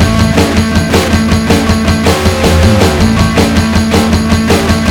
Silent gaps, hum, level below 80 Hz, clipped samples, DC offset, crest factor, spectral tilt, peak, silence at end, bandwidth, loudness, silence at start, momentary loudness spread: none; none; -18 dBFS; 0.8%; under 0.1%; 8 dB; -5.5 dB/octave; 0 dBFS; 0 s; 17.5 kHz; -9 LUFS; 0 s; 2 LU